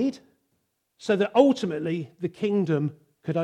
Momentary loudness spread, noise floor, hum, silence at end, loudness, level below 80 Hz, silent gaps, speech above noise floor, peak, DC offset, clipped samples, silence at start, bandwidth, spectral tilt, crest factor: 13 LU; -75 dBFS; none; 0 s; -25 LUFS; -72 dBFS; none; 50 dB; -4 dBFS; under 0.1%; under 0.1%; 0 s; 10 kHz; -7 dB/octave; 20 dB